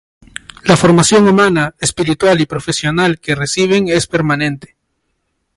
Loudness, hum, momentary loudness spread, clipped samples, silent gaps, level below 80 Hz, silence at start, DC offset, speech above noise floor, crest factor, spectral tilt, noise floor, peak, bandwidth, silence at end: -13 LUFS; none; 11 LU; under 0.1%; none; -42 dBFS; 0.65 s; under 0.1%; 55 dB; 14 dB; -4.5 dB/octave; -67 dBFS; 0 dBFS; 11.5 kHz; 1 s